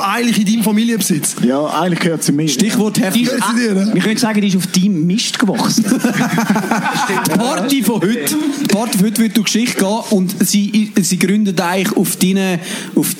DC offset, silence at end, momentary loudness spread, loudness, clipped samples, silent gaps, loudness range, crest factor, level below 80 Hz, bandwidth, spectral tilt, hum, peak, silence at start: under 0.1%; 0 s; 2 LU; -14 LUFS; under 0.1%; none; 1 LU; 14 dB; -62 dBFS; 16.5 kHz; -4.5 dB/octave; none; 0 dBFS; 0 s